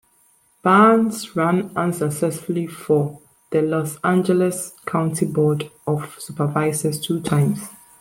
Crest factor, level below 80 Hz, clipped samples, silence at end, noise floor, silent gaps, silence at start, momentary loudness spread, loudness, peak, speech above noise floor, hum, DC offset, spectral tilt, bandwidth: 18 dB; -60 dBFS; under 0.1%; 0.25 s; -59 dBFS; none; 0.65 s; 10 LU; -20 LUFS; -2 dBFS; 39 dB; none; under 0.1%; -6 dB/octave; 16.5 kHz